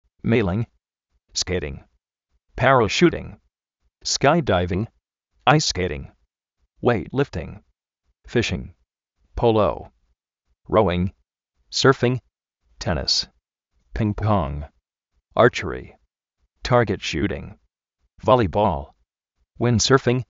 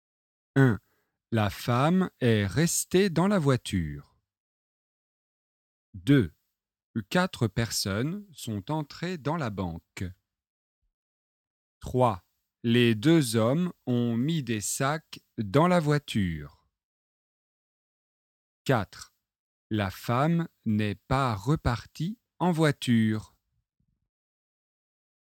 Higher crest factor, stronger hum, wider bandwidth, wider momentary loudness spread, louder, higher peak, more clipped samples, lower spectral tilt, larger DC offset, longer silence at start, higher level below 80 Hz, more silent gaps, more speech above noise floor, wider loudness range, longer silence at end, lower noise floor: about the same, 22 dB vs 22 dB; neither; second, 8 kHz vs 17.5 kHz; first, 17 LU vs 13 LU; first, -21 LUFS vs -27 LUFS; first, 0 dBFS vs -8 dBFS; neither; about the same, -4.5 dB/octave vs -5.5 dB/octave; neither; second, 0.25 s vs 0.55 s; first, -42 dBFS vs -54 dBFS; second, none vs 4.40-5.93 s, 6.84-6.94 s, 10.50-10.82 s, 10.94-11.81 s, 16.84-18.65 s, 19.39-19.70 s; first, 53 dB vs 48 dB; second, 4 LU vs 9 LU; second, 0.1 s vs 2.05 s; about the same, -73 dBFS vs -74 dBFS